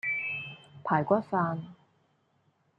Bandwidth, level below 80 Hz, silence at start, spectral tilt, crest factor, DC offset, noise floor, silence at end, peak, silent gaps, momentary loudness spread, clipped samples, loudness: 8.6 kHz; -74 dBFS; 0.05 s; -8.5 dB/octave; 22 dB; under 0.1%; -71 dBFS; 1.05 s; -10 dBFS; none; 15 LU; under 0.1%; -30 LUFS